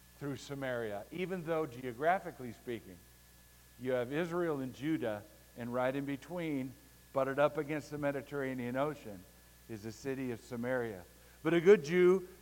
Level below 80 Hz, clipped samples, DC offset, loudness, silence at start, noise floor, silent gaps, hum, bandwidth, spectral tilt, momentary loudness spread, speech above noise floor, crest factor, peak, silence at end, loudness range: -66 dBFS; under 0.1%; under 0.1%; -35 LUFS; 0.2 s; -61 dBFS; none; 60 Hz at -65 dBFS; 17 kHz; -6.5 dB/octave; 17 LU; 26 dB; 22 dB; -14 dBFS; 0.05 s; 5 LU